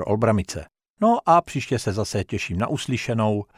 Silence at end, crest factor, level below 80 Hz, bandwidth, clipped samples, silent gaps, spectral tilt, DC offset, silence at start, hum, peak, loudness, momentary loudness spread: 0.15 s; 18 dB; -50 dBFS; 14.5 kHz; under 0.1%; 0.90-0.94 s; -6 dB/octave; under 0.1%; 0 s; none; -4 dBFS; -23 LUFS; 8 LU